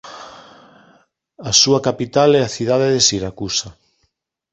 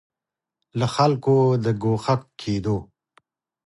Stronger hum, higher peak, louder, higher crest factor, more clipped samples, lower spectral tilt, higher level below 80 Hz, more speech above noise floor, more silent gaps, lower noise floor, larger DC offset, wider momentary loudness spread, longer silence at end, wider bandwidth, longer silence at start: neither; first, 0 dBFS vs -6 dBFS; first, -15 LUFS vs -22 LUFS; about the same, 18 dB vs 18 dB; neither; second, -3 dB/octave vs -7.5 dB/octave; about the same, -50 dBFS vs -52 dBFS; second, 52 dB vs 67 dB; neither; second, -68 dBFS vs -88 dBFS; neither; first, 21 LU vs 9 LU; about the same, 0.8 s vs 0.8 s; second, 8.2 kHz vs 11.5 kHz; second, 0.05 s vs 0.75 s